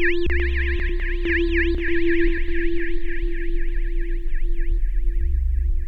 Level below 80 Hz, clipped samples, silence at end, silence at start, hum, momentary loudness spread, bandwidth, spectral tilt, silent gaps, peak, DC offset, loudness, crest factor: -22 dBFS; under 0.1%; 0 s; 0 s; none; 8 LU; 4.8 kHz; -8 dB/octave; none; -8 dBFS; under 0.1%; -25 LUFS; 12 dB